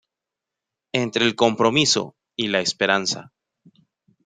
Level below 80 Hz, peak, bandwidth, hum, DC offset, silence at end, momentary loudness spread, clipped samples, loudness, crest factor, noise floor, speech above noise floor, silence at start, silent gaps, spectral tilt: -64 dBFS; -2 dBFS; 9.6 kHz; none; under 0.1%; 1.05 s; 10 LU; under 0.1%; -20 LUFS; 22 dB; -86 dBFS; 65 dB; 0.95 s; none; -3 dB/octave